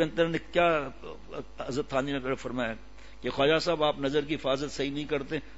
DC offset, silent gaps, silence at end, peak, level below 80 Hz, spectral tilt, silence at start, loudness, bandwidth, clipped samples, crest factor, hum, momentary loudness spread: 0.5%; none; 0 s; -12 dBFS; -52 dBFS; -5 dB/octave; 0 s; -29 LUFS; 8 kHz; under 0.1%; 18 dB; none; 15 LU